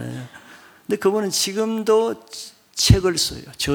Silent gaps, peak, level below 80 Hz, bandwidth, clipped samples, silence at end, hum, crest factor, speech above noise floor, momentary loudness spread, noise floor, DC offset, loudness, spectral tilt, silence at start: none; 0 dBFS; -36 dBFS; 19.5 kHz; under 0.1%; 0 s; none; 22 dB; 27 dB; 19 LU; -47 dBFS; under 0.1%; -20 LUFS; -4.5 dB/octave; 0 s